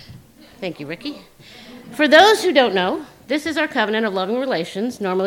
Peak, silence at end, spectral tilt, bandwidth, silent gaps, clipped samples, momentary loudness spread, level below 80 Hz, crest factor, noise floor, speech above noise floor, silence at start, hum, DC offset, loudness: 0 dBFS; 0 s; -4 dB/octave; 17 kHz; none; under 0.1%; 19 LU; -60 dBFS; 20 dB; -43 dBFS; 25 dB; 0.1 s; none; under 0.1%; -17 LUFS